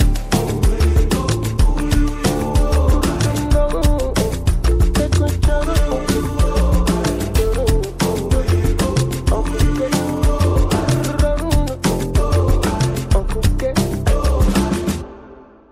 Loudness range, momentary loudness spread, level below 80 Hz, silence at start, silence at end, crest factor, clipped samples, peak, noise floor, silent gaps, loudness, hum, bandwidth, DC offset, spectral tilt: 1 LU; 3 LU; -18 dBFS; 0 s; 0.3 s; 14 dB; under 0.1%; -2 dBFS; -41 dBFS; none; -18 LUFS; none; 16 kHz; under 0.1%; -6 dB/octave